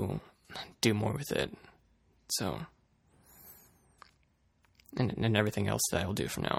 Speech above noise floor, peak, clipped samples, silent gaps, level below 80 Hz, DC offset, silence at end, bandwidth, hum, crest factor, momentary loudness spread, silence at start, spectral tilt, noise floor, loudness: 39 dB; -10 dBFS; under 0.1%; none; -58 dBFS; under 0.1%; 0 s; 17.5 kHz; none; 24 dB; 20 LU; 0 s; -4.5 dB/octave; -71 dBFS; -33 LUFS